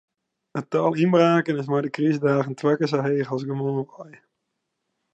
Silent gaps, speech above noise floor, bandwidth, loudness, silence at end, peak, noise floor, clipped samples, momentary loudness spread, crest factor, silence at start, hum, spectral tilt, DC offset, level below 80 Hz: none; 57 dB; 8.4 kHz; -22 LUFS; 1.05 s; -6 dBFS; -79 dBFS; under 0.1%; 10 LU; 18 dB; 0.55 s; none; -7.5 dB/octave; under 0.1%; -76 dBFS